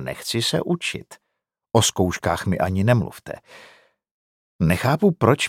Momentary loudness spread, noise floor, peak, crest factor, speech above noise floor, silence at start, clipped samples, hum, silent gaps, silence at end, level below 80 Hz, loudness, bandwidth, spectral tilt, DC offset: 14 LU; -79 dBFS; -2 dBFS; 22 dB; 58 dB; 0 s; under 0.1%; none; 4.11-4.59 s; 0 s; -52 dBFS; -21 LUFS; 16.5 kHz; -5 dB/octave; under 0.1%